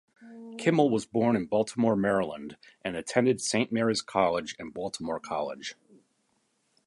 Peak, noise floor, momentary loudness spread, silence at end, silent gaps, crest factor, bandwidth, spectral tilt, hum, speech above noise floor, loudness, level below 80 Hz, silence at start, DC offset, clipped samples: -8 dBFS; -73 dBFS; 14 LU; 1.15 s; none; 20 dB; 11.5 kHz; -5 dB/octave; none; 45 dB; -28 LUFS; -64 dBFS; 0.2 s; under 0.1%; under 0.1%